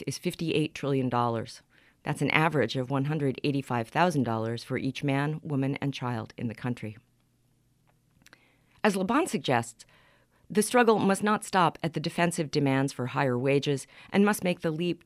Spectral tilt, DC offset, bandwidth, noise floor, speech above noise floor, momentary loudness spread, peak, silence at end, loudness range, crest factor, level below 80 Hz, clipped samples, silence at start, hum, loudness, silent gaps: -5.5 dB/octave; under 0.1%; 15.5 kHz; -68 dBFS; 40 dB; 10 LU; -6 dBFS; 0.1 s; 7 LU; 24 dB; -66 dBFS; under 0.1%; 0 s; none; -28 LUFS; none